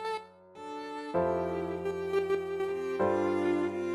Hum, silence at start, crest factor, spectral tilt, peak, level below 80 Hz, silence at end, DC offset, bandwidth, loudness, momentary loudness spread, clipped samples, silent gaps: none; 0 s; 16 dB; -7 dB/octave; -16 dBFS; -64 dBFS; 0 s; under 0.1%; 12.5 kHz; -32 LUFS; 12 LU; under 0.1%; none